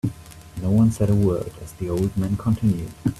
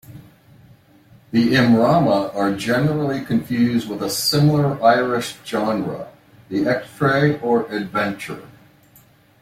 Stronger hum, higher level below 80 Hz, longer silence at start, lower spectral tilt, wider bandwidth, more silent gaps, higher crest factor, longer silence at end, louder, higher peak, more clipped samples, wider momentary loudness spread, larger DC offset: neither; first, -42 dBFS vs -54 dBFS; about the same, 0.05 s vs 0.1 s; first, -8.5 dB/octave vs -6 dB/octave; second, 14 kHz vs 16 kHz; neither; about the same, 14 dB vs 18 dB; second, 0 s vs 0.95 s; second, -22 LUFS vs -19 LUFS; second, -8 dBFS vs -2 dBFS; neither; first, 14 LU vs 10 LU; neither